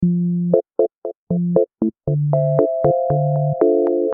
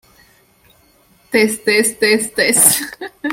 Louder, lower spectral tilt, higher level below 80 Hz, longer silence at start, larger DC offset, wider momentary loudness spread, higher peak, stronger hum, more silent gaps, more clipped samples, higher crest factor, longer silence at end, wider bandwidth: second, -18 LUFS vs -13 LUFS; first, -14.5 dB/octave vs -1.5 dB/octave; first, -50 dBFS vs -56 dBFS; second, 0 s vs 1.3 s; neither; second, 6 LU vs 10 LU; about the same, 0 dBFS vs 0 dBFS; neither; first, 0.98-1.02 s, 1.17-1.27 s vs none; neither; about the same, 16 dB vs 18 dB; about the same, 0 s vs 0 s; second, 2.2 kHz vs 17 kHz